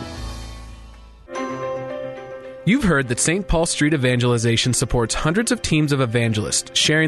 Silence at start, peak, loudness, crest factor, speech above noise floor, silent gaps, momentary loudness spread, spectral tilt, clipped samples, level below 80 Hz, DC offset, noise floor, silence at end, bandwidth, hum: 0 s; -6 dBFS; -19 LUFS; 16 dB; 23 dB; none; 16 LU; -4 dB/octave; under 0.1%; -36 dBFS; under 0.1%; -42 dBFS; 0 s; 12.5 kHz; none